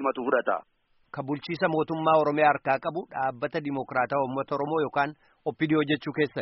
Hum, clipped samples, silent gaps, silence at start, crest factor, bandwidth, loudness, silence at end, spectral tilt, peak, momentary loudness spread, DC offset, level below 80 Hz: none; under 0.1%; none; 0 s; 18 dB; 5.8 kHz; -27 LUFS; 0 s; -4.5 dB/octave; -8 dBFS; 10 LU; under 0.1%; -68 dBFS